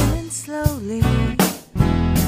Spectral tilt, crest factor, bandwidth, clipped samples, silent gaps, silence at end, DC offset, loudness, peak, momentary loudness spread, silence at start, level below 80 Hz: -5.5 dB/octave; 18 dB; 16 kHz; under 0.1%; none; 0 s; under 0.1%; -20 LUFS; 0 dBFS; 5 LU; 0 s; -26 dBFS